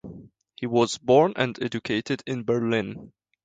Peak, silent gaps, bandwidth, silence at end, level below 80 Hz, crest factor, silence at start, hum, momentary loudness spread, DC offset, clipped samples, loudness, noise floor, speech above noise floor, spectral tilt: -6 dBFS; none; 9.4 kHz; 0.35 s; -62 dBFS; 20 dB; 0.05 s; none; 16 LU; under 0.1%; under 0.1%; -24 LUFS; -46 dBFS; 22 dB; -5.5 dB/octave